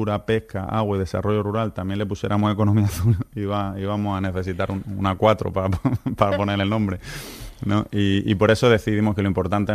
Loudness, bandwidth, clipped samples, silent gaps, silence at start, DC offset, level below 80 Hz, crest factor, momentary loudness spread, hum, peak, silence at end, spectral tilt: -22 LUFS; 14.5 kHz; under 0.1%; none; 0 s; under 0.1%; -42 dBFS; 18 dB; 8 LU; none; -2 dBFS; 0 s; -7 dB/octave